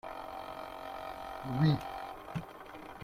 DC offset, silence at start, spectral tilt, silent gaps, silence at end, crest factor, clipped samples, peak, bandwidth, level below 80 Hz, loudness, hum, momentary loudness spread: under 0.1%; 0.05 s; -7.5 dB/octave; none; 0 s; 20 dB; under 0.1%; -18 dBFS; 15 kHz; -60 dBFS; -37 LUFS; none; 15 LU